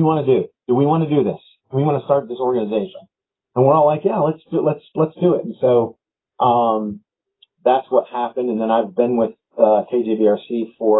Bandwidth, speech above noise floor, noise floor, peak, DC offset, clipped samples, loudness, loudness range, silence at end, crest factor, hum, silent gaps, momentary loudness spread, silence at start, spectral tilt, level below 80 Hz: 4 kHz; 42 dB; -59 dBFS; 0 dBFS; under 0.1%; under 0.1%; -18 LUFS; 1 LU; 0 s; 18 dB; none; none; 8 LU; 0 s; -13 dB/octave; -64 dBFS